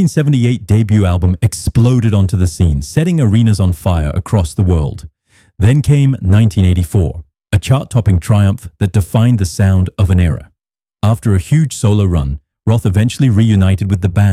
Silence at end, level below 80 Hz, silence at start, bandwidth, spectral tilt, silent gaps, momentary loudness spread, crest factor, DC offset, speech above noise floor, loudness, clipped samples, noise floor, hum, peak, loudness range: 0 s; -28 dBFS; 0 s; 14 kHz; -7 dB/octave; none; 5 LU; 10 dB; under 0.1%; 63 dB; -13 LUFS; under 0.1%; -74 dBFS; none; -2 dBFS; 2 LU